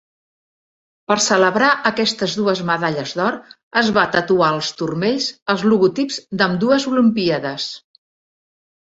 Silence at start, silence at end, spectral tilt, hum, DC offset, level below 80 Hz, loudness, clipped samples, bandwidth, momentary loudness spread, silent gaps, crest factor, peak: 1.1 s; 1.05 s; -4 dB/octave; none; under 0.1%; -58 dBFS; -18 LUFS; under 0.1%; 8 kHz; 8 LU; 3.63-3.71 s, 5.42-5.46 s; 18 dB; -2 dBFS